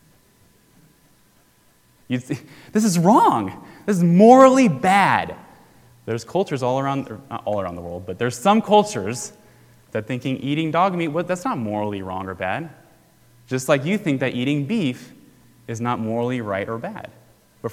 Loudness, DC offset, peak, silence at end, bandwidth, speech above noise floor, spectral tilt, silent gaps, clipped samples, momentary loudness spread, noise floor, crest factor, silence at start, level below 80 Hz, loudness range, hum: -20 LUFS; under 0.1%; 0 dBFS; 0 s; 16 kHz; 38 dB; -6 dB/octave; none; under 0.1%; 17 LU; -57 dBFS; 20 dB; 2.1 s; -56 dBFS; 9 LU; none